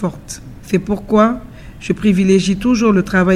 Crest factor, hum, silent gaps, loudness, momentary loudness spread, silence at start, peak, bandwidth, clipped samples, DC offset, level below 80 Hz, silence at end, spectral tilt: 14 dB; none; none; -15 LUFS; 18 LU; 0 s; 0 dBFS; 13 kHz; under 0.1%; under 0.1%; -38 dBFS; 0 s; -6.5 dB/octave